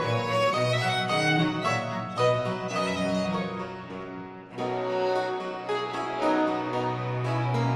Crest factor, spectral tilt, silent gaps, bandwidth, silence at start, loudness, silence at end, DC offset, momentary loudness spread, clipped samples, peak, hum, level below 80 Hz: 16 dB; -5.5 dB/octave; none; 13 kHz; 0 s; -27 LUFS; 0 s; under 0.1%; 11 LU; under 0.1%; -12 dBFS; none; -62 dBFS